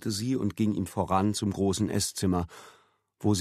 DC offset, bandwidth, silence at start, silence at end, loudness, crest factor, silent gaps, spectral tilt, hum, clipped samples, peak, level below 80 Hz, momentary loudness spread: under 0.1%; 14 kHz; 0 s; 0 s; -28 LUFS; 18 dB; none; -5.5 dB/octave; none; under 0.1%; -12 dBFS; -54 dBFS; 5 LU